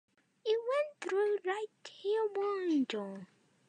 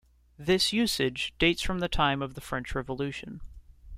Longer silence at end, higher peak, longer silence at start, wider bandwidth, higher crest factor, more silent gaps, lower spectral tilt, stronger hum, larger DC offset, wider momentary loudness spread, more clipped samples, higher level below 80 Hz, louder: first, 0.45 s vs 0 s; second, -20 dBFS vs -10 dBFS; about the same, 0.45 s vs 0.4 s; second, 9.8 kHz vs 16 kHz; second, 14 dB vs 20 dB; neither; about the same, -5 dB/octave vs -4 dB/octave; neither; neither; about the same, 10 LU vs 12 LU; neither; second, under -90 dBFS vs -42 dBFS; second, -35 LUFS vs -28 LUFS